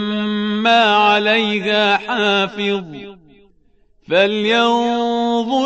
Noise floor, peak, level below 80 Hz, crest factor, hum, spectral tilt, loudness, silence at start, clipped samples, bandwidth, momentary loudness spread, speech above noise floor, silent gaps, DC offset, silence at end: -56 dBFS; -2 dBFS; -58 dBFS; 16 dB; none; -4.5 dB/octave; -15 LUFS; 0 s; under 0.1%; 8.4 kHz; 8 LU; 41 dB; none; 0.1%; 0 s